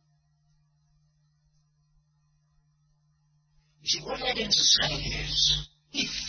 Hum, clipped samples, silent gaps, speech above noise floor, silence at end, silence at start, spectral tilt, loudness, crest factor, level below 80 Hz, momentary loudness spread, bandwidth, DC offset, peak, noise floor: none; under 0.1%; none; 42 dB; 0 s; 3.85 s; -1 dB/octave; -25 LUFS; 24 dB; -48 dBFS; 11 LU; 6.8 kHz; under 0.1%; -8 dBFS; -69 dBFS